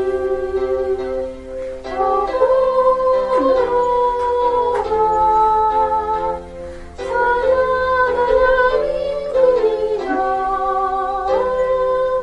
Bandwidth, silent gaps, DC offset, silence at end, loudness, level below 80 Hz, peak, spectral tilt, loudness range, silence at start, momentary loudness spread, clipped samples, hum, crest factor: 9.4 kHz; none; under 0.1%; 0 s; -17 LUFS; -38 dBFS; -2 dBFS; -5.5 dB/octave; 2 LU; 0 s; 10 LU; under 0.1%; none; 14 dB